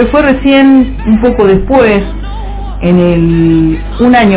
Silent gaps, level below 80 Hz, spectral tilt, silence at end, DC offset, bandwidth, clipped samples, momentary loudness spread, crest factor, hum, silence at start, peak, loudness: none; -20 dBFS; -11 dB/octave; 0 s; under 0.1%; 4 kHz; 4%; 14 LU; 8 dB; 50 Hz at -20 dBFS; 0 s; 0 dBFS; -8 LUFS